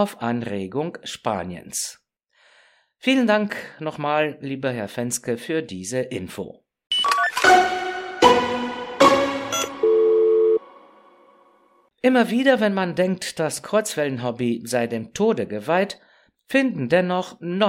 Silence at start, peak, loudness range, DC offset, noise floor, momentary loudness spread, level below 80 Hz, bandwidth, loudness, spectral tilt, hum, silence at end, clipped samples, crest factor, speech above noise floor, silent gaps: 0 s; -2 dBFS; 7 LU; under 0.1%; -60 dBFS; 12 LU; -60 dBFS; 16.5 kHz; -21 LUFS; -4 dB/octave; none; 0 s; under 0.1%; 20 dB; 38 dB; none